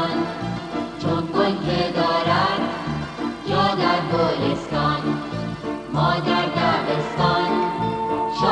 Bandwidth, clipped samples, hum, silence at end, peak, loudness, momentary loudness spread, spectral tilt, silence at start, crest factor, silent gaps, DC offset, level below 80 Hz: 10.5 kHz; under 0.1%; none; 0 s; -6 dBFS; -22 LUFS; 9 LU; -6.5 dB/octave; 0 s; 16 dB; none; under 0.1%; -46 dBFS